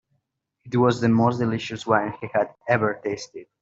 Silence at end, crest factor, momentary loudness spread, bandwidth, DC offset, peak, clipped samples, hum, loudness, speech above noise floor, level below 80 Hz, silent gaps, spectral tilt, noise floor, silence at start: 0.2 s; 20 dB; 10 LU; 7.8 kHz; under 0.1%; -4 dBFS; under 0.1%; none; -23 LUFS; 53 dB; -62 dBFS; none; -6.5 dB/octave; -75 dBFS; 0.65 s